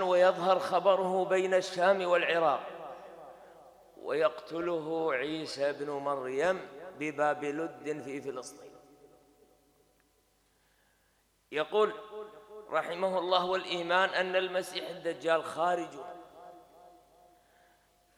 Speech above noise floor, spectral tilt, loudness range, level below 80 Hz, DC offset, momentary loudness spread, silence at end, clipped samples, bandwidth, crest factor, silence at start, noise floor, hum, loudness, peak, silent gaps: 40 dB; -4 dB/octave; 8 LU; -76 dBFS; under 0.1%; 19 LU; 1.3 s; under 0.1%; 13.5 kHz; 22 dB; 0 s; -71 dBFS; 50 Hz at -75 dBFS; -31 LUFS; -10 dBFS; none